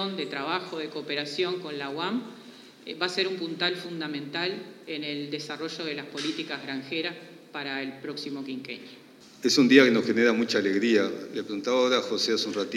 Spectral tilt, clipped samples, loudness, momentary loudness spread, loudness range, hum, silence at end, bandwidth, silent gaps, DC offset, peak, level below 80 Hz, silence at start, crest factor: -4 dB/octave; under 0.1%; -27 LUFS; 14 LU; 10 LU; none; 0 s; 14.5 kHz; none; under 0.1%; -4 dBFS; -86 dBFS; 0 s; 24 dB